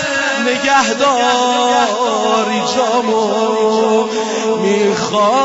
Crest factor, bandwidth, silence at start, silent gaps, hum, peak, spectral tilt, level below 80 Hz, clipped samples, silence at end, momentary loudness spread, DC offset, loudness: 12 dB; 8 kHz; 0 s; none; none; -2 dBFS; -3 dB/octave; -58 dBFS; under 0.1%; 0 s; 3 LU; under 0.1%; -14 LUFS